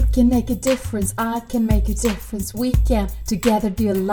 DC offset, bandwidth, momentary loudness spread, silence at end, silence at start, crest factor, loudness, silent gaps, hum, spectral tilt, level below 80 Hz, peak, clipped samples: under 0.1%; over 20 kHz; 6 LU; 0 s; 0 s; 14 dB; -21 LUFS; none; none; -6 dB/octave; -24 dBFS; -4 dBFS; under 0.1%